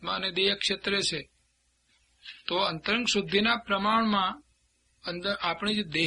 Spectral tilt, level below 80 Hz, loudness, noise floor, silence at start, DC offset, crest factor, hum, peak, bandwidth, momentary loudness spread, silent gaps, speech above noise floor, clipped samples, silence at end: -3.5 dB/octave; -60 dBFS; -27 LUFS; -71 dBFS; 0 s; under 0.1%; 18 dB; 60 Hz at -60 dBFS; -10 dBFS; 11 kHz; 13 LU; none; 42 dB; under 0.1%; 0 s